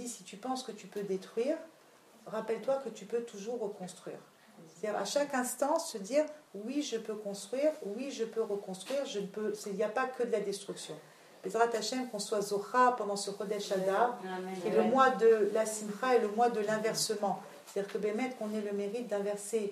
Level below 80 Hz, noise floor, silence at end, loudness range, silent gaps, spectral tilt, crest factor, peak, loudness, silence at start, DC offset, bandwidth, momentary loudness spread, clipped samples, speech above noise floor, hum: under -90 dBFS; -60 dBFS; 0 s; 8 LU; none; -3.5 dB/octave; 22 dB; -12 dBFS; -34 LUFS; 0 s; under 0.1%; 15.5 kHz; 13 LU; under 0.1%; 27 dB; none